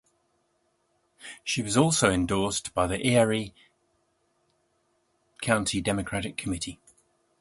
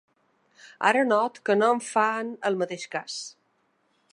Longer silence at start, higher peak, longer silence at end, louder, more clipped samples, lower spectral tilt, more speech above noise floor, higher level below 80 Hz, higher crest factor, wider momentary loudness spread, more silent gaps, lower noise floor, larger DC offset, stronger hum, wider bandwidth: first, 1.2 s vs 0.65 s; about the same, -6 dBFS vs -6 dBFS; second, 0.65 s vs 0.8 s; about the same, -26 LUFS vs -25 LUFS; neither; about the same, -4 dB/octave vs -4 dB/octave; about the same, 46 dB vs 45 dB; first, -50 dBFS vs -84 dBFS; about the same, 24 dB vs 20 dB; about the same, 14 LU vs 12 LU; neither; about the same, -72 dBFS vs -70 dBFS; neither; neither; about the same, 12 kHz vs 11 kHz